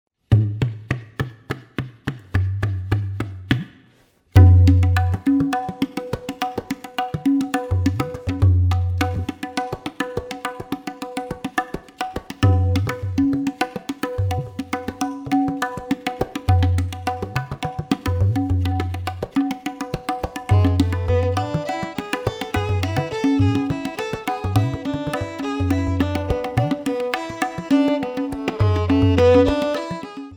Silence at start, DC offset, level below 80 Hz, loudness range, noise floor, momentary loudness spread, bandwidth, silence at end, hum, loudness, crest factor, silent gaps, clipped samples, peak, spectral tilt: 0.3 s; under 0.1%; -36 dBFS; 6 LU; -56 dBFS; 11 LU; 15.5 kHz; 0 s; none; -22 LUFS; 20 dB; none; under 0.1%; -2 dBFS; -7 dB/octave